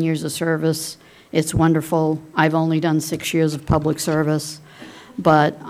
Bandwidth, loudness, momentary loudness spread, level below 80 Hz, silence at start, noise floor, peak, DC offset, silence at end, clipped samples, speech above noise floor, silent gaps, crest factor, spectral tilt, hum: 16 kHz; -20 LUFS; 14 LU; -44 dBFS; 0 s; -41 dBFS; -2 dBFS; under 0.1%; 0 s; under 0.1%; 22 dB; none; 18 dB; -5.5 dB/octave; none